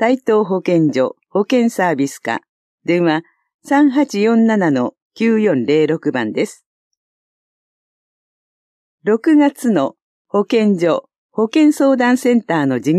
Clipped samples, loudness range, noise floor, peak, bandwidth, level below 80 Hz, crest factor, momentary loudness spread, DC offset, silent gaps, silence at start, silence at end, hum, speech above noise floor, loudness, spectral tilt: under 0.1%; 5 LU; under -90 dBFS; -2 dBFS; 13.5 kHz; -72 dBFS; 14 dB; 9 LU; under 0.1%; 2.49-2.78 s, 3.54-3.59 s, 5.02-5.10 s, 6.66-6.91 s, 6.97-8.98 s, 10.02-10.25 s, 11.18-11.29 s; 0 s; 0 s; none; over 76 dB; -16 LUFS; -6.5 dB/octave